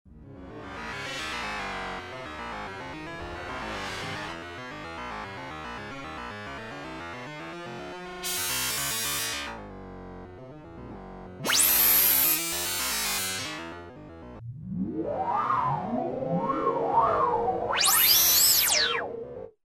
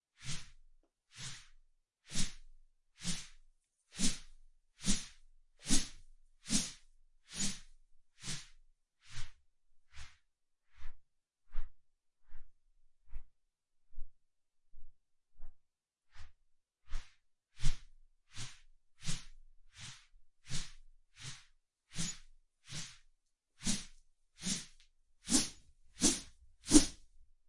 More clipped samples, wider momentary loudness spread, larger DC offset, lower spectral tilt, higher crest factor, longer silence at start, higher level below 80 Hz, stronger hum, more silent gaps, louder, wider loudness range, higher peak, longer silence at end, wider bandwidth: neither; about the same, 24 LU vs 26 LU; neither; about the same, -1.5 dB/octave vs -2.5 dB/octave; second, 20 dB vs 30 dB; second, 0.05 s vs 0.2 s; second, -54 dBFS vs -46 dBFS; neither; neither; first, -24 LUFS vs -38 LUFS; second, 15 LU vs 22 LU; about the same, -8 dBFS vs -10 dBFS; about the same, 0.2 s vs 0.25 s; first, 17.5 kHz vs 11.5 kHz